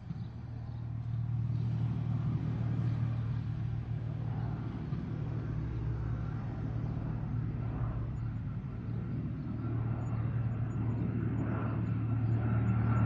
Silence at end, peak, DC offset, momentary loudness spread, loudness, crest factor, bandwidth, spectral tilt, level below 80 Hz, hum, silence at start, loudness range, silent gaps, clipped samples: 0 s; -20 dBFS; under 0.1%; 6 LU; -36 LUFS; 14 dB; 4.6 kHz; -10.5 dB/octave; -46 dBFS; none; 0 s; 3 LU; none; under 0.1%